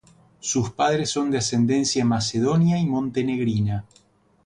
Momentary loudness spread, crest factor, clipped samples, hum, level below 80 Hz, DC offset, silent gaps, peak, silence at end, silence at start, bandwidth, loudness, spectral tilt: 5 LU; 14 dB; under 0.1%; none; -52 dBFS; under 0.1%; none; -8 dBFS; 0.65 s; 0.45 s; 11 kHz; -22 LUFS; -5 dB/octave